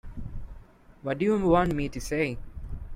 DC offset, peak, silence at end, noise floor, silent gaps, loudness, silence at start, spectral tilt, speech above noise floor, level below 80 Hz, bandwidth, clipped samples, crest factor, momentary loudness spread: under 0.1%; -10 dBFS; 0 s; -50 dBFS; none; -27 LUFS; 0.05 s; -6.5 dB/octave; 24 dB; -40 dBFS; 16 kHz; under 0.1%; 18 dB; 19 LU